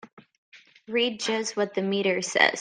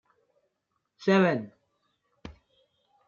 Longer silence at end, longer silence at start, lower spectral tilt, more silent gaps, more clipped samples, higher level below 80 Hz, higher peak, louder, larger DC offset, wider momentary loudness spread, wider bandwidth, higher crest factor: second, 0 s vs 0.75 s; second, 0.05 s vs 1 s; second, -3 dB/octave vs -7 dB/octave; first, 0.13-0.17 s, 0.38-0.52 s vs none; neither; second, -78 dBFS vs -64 dBFS; first, -2 dBFS vs -10 dBFS; about the same, -25 LUFS vs -26 LUFS; neither; second, 6 LU vs 26 LU; first, 10.5 kHz vs 7 kHz; about the same, 24 dB vs 20 dB